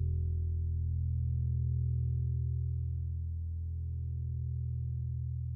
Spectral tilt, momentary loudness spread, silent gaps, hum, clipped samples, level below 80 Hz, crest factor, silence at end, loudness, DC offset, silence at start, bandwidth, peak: -17 dB/octave; 5 LU; none; none; under 0.1%; -40 dBFS; 8 dB; 0 s; -36 LUFS; under 0.1%; 0 s; 0.5 kHz; -26 dBFS